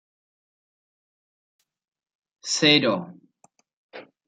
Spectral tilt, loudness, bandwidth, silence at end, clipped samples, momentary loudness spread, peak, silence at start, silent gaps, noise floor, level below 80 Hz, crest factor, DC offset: -3 dB/octave; -20 LUFS; 9.6 kHz; 0.25 s; under 0.1%; 21 LU; -4 dBFS; 2.45 s; 3.73-3.89 s; -63 dBFS; -74 dBFS; 24 dB; under 0.1%